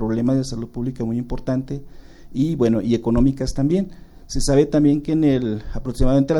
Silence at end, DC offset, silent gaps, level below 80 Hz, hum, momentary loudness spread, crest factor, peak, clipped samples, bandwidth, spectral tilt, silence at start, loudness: 0 s; under 0.1%; none; -30 dBFS; none; 12 LU; 16 dB; -4 dBFS; under 0.1%; 12 kHz; -7 dB/octave; 0 s; -20 LUFS